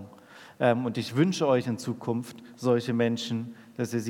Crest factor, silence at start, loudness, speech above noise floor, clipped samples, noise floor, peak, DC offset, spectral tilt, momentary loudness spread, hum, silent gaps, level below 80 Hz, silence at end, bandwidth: 20 dB; 0 s; -28 LUFS; 24 dB; under 0.1%; -51 dBFS; -8 dBFS; under 0.1%; -6 dB/octave; 10 LU; none; none; -78 dBFS; 0 s; 16.5 kHz